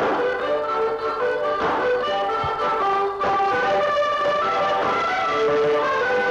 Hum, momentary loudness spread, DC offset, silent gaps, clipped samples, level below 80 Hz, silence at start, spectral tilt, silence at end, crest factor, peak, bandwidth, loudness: none; 3 LU; under 0.1%; none; under 0.1%; -54 dBFS; 0 s; -4.5 dB/octave; 0 s; 10 dB; -12 dBFS; 9.6 kHz; -21 LUFS